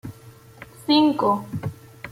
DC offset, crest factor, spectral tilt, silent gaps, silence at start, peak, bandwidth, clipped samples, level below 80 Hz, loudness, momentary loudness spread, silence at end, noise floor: under 0.1%; 16 dB; -6.5 dB/octave; none; 0.05 s; -6 dBFS; 15.5 kHz; under 0.1%; -58 dBFS; -21 LUFS; 21 LU; 0 s; -47 dBFS